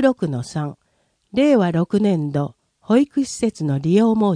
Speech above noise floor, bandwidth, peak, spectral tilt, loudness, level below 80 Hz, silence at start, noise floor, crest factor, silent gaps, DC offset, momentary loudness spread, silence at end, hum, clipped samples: 48 dB; 10.5 kHz; -2 dBFS; -7 dB/octave; -19 LUFS; -56 dBFS; 0 s; -66 dBFS; 16 dB; none; under 0.1%; 11 LU; 0 s; none; under 0.1%